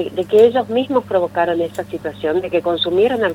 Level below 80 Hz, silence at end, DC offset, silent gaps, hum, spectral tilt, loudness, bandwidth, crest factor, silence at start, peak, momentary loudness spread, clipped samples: -54 dBFS; 0 s; under 0.1%; none; none; -6 dB/octave; -17 LUFS; 16 kHz; 16 dB; 0 s; 0 dBFS; 11 LU; under 0.1%